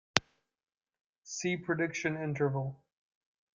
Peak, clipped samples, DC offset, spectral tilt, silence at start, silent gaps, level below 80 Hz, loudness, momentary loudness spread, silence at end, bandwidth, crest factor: -2 dBFS; under 0.1%; under 0.1%; -4.5 dB/octave; 0.15 s; 0.77-0.81 s, 1.01-1.22 s; -70 dBFS; -34 LUFS; 6 LU; 0.8 s; 9.4 kHz; 34 dB